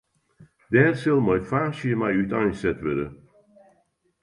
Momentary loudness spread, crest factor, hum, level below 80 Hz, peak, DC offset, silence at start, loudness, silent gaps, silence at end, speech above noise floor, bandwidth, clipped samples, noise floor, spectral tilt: 8 LU; 22 dB; none; -52 dBFS; -4 dBFS; under 0.1%; 0.4 s; -23 LUFS; none; 1.1 s; 45 dB; 11 kHz; under 0.1%; -67 dBFS; -8 dB/octave